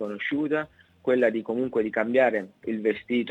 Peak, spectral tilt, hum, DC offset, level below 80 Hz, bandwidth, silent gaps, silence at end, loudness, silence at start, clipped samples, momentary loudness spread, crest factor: -8 dBFS; -7.5 dB/octave; none; under 0.1%; -68 dBFS; 8.4 kHz; none; 0 s; -26 LUFS; 0 s; under 0.1%; 9 LU; 18 dB